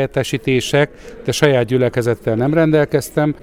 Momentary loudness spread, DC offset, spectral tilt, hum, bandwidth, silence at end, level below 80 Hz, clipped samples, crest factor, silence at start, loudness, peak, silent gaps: 6 LU; under 0.1%; -6 dB/octave; none; 16.5 kHz; 0.05 s; -44 dBFS; under 0.1%; 16 dB; 0 s; -16 LUFS; 0 dBFS; none